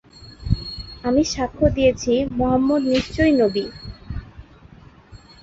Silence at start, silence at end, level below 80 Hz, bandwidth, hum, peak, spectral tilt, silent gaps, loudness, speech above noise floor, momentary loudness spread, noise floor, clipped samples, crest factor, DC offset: 0.2 s; 0.25 s; -36 dBFS; 8 kHz; none; -2 dBFS; -6 dB/octave; none; -20 LUFS; 27 dB; 17 LU; -46 dBFS; under 0.1%; 18 dB; under 0.1%